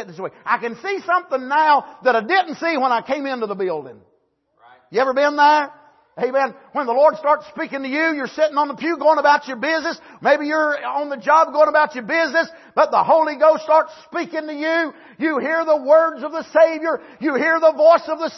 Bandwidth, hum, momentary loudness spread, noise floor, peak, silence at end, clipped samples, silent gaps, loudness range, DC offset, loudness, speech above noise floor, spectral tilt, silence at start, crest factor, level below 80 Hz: 6.2 kHz; none; 11 LU; -64 dBFS; -2 dBFS; 0 s; under 0.1%; none; 4 LU; under 0.1%; -18 LUFS; 46 dB; -4.5 dB/octave; 0 s; 16 dB; -74 dBFS